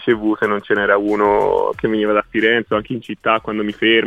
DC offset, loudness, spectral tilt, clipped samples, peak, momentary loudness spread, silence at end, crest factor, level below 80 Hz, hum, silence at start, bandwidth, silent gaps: under 0.1%; -17 LUFS; -6.5 dB/octave; under 0.1%; -2 dBFS; 6 LU; 0 s; 14 dB; -48 dBFS; none; 0 s; 8.2 kHz; none